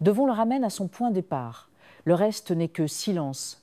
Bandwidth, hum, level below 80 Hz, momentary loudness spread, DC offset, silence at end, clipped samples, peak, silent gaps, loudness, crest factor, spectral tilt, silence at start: 15.5 kHz; none; -72 dBFS; 9 LU; under 0.1%; 0.1 s; under 0.1%; -8 dBFS; none; -26 LUFS; 18 dB; -6 dB/octave; 0 s